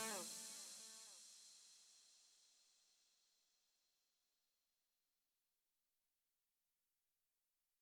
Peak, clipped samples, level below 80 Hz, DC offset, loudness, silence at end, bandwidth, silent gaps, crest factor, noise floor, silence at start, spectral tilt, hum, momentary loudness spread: -36 dBFS; under 0.1%; under -90 dBFS; under 0.1%; -54 LUFS; 4.8 s; 16.5 kHz; none; 26 dB; under -90 dBFS; 0 s; 0 dB/octave; none; 19 LU